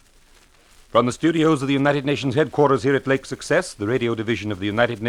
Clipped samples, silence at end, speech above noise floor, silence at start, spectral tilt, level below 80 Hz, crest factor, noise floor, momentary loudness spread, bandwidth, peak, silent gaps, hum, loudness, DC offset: under 0.1%; 0 s; 33 dB; 0.95 s; -6 dB/octave; -52 dBFS; 18 dB; -53 dBFS; 6 LU; 13 kHz; -4 dBFS; none; none; -21 LUFS; under 0.1%